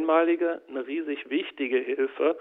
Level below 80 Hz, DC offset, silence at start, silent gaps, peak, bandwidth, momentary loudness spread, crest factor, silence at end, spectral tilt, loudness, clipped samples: -78 dBFS; under 0.1%; 0 s; none; -10 dBFS; 3.9 kHz; 9 LU; 16 dB; 0 s; -6.5 dB/octave; -27 LUFS; under 0.1%